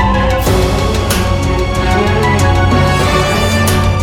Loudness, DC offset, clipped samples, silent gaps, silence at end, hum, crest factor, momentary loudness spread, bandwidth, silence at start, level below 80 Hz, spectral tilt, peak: -12 LUFS; under 0.1%; under 0.1%; none; 0 s; none; 12 dB; 3 LU; 18 kHz; 0 s; -18 dBFS; -5.5 dB/octave; 0 dBFS